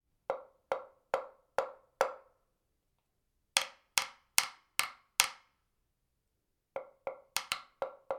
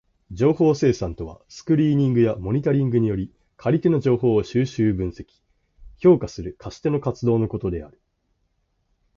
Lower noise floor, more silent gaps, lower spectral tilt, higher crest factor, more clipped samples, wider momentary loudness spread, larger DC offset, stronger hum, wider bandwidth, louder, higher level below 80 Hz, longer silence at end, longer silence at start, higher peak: first, -82 dBFS vs -70 dBFS; neither; second, 1.5 dB/octave vs -8.5 dB/octave; first, 36 dB vs 16 dB; neither; about the same, 14 LU vs 15 LU; neither; neither; first, 17 kHz vs 7.4 kHz; second, -36 LUFS vs -21 LUFS; second, -76 dBFS vs -44 dBFS; second, 0 s vs 1.3 s; about the same, 0.3 s vs 0.3 s; first, -2 dBFS vs -6 dBFS